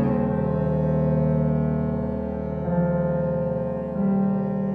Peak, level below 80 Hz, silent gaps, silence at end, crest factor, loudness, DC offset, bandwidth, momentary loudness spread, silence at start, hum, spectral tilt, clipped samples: -10 dBFS; -40 dBFS; none; 0 s; 12 dB; -24 LUFS; under 0.1%; 3.5 kHz; 6 LU; 0 s; none; -12 dB/octave; under 0.1%